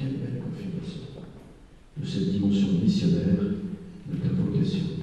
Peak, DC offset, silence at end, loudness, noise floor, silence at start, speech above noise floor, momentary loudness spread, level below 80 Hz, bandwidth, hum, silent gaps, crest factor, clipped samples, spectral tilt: -12 dBFS; under 0.1%; 0 s; -27 LUFS; -49 dBFS; 0 s; 26 dB; 17 LU; -52 dBFS; 8.8 kHz; none; none; 14 dB; under 0.1%; -8 dB/octave